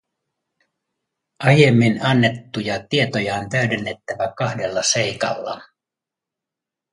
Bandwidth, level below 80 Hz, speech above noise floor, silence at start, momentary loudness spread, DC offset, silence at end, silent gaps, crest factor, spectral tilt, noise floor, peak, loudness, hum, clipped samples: 11.5 kHz; -56 dBFS; 68 dB; 1.4 s; 13 LU; under 0.1%; 1.3 s; none; 20 dB; -5 dB/octave; -86 dBFS; 0 dBFS; -19 LUFS; none; under 0.1%